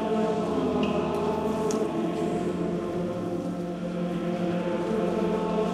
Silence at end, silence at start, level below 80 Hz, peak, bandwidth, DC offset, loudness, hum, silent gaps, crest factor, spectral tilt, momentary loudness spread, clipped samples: 0 s; 0 s; -52 dBFS; -14 dBFS; 13.5 kHz; under 0.1%; -28 LUFS; none; none; 14 dB; -7 dB/octave; 5 LU; under 0.1%